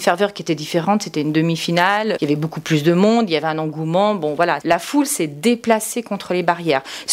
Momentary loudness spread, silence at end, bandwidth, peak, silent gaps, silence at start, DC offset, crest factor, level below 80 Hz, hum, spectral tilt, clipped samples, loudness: 6 LU; 0 s; 16 kHz; 0 dBFS; none; 0 s; under 0.1%; 18 dB; -62 dBFS; none; -5 dB/octave; under 0.1%; -18 LUFS